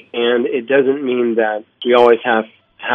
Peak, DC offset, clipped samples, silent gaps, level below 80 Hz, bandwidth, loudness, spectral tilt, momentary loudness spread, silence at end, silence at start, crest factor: 0 dBFS; under 0.1%; 0.1%; none; -68 dBFS; 5.8 kHz; -15 LUFS; -6.5 dB/octave; 10 LU; 0 s; 0.15 s; 16 dB